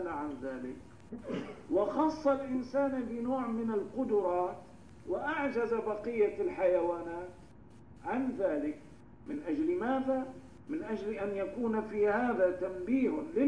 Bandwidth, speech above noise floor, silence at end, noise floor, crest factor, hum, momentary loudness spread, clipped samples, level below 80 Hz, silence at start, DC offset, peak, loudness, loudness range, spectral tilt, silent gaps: 10.5 kHz; 23 dB; 0 s; -55 dBFS; 16 dB; none; 14 LU; under 0.1%; -62 dBFS; 0 s; 0.1%; -18 dBFS; -33 LUFS; 3 LU; -7.5 dB/octave; none